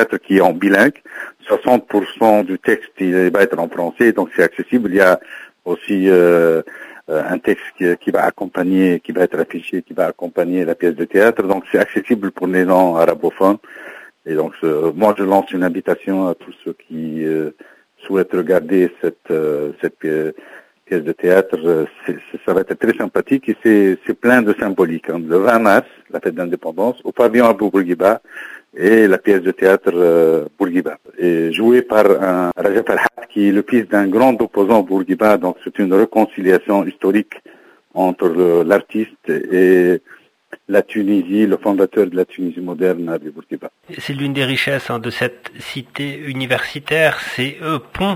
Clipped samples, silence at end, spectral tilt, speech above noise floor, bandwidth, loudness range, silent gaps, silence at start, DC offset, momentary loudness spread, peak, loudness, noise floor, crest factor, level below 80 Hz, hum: under 0.1%; 0 s; -6.5 dB/octave; 25 dB; 16 kHz; 5 LU; none; 0 s; under 0.1%; 12 LU; 0 dBFS; -16 LUFS; -41 dBFS; 16 dB; -56 dBFS; none